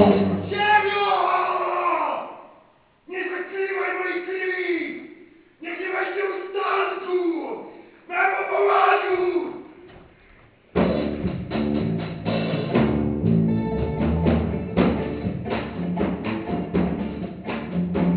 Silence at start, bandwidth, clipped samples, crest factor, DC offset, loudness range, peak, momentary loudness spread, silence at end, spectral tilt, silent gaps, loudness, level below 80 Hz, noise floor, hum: 0 s; 4 kHz; under 0.1%; 20 dB; under 0.1%; 4 LU; -2 dBFS; 11 LU; 0 s; -10.5 dB/octave; none; -23 LUFS; -40 dBFS; -56 dBFS; none